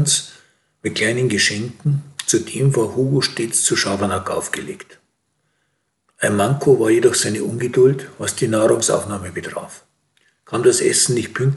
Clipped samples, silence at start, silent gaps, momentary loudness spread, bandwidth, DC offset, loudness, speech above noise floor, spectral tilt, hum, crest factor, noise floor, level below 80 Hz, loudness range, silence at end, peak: under 0.1%; 0 s; none; 12 LU; 12.5 kHz; under 0.1%; -18 LUFS; 52 dB; -4 dB/octave; none; 16 dB; -70 dBFS; -60 dBFS; 4 LU; 0 s; -2 dBFS